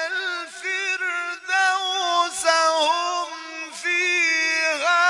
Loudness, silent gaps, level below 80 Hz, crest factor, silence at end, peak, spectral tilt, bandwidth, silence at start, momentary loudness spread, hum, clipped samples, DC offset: -21 LUFS; none; -74 dBFS; 18 dB; 0 s; -4 dBFS; 2 dB/octave; 11.5 kHz; 0 s; 10 LU; none; under 0.1%; under 0.1%